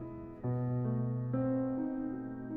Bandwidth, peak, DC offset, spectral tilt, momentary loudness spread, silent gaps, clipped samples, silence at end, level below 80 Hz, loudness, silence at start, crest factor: 2.7 kHz; -22 dBFS; under 0.1%; -12 dB/octave; 8 LU; none; under 0.1%; 0 s; -60 dBFS; -36 LUFS; 0 s; 12 dB